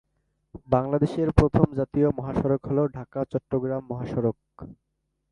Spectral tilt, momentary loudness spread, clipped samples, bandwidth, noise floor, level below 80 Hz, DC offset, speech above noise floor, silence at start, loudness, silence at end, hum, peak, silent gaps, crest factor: -9.5 dB/octave; 10 LU; under 0.1%; 10.5 kHz; -73 dBFS; -40 dBFS; under 0.1%; 48 dB; 0.55 s; -25 LUFS; 0.6 s; none; 0 dBFS; none; 26 dB